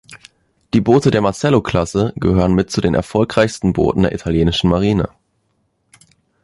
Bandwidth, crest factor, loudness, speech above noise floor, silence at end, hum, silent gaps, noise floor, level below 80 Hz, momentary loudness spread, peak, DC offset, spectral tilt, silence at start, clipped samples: 11.5 kHz; 16 dB; -16 LUFS; 50 dB; 1.35 s; none; none; -65 dBFS; -34 dBFS; 5 LU; -2 dBFS; under 0.1%; -6.5 dB/octave; 0.1 s; under 0.1%